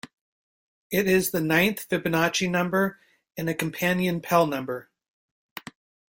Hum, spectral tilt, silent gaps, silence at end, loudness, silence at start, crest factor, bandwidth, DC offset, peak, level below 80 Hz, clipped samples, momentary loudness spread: none; -5 dB/octave; 0.13-0.90 s; 1.35 s; -24 LUFS; 0.05 s; 20 dB; 17 kHz; under 0.1%; -6 dBFS; -60 dBFS; under 0.1%; 17 LU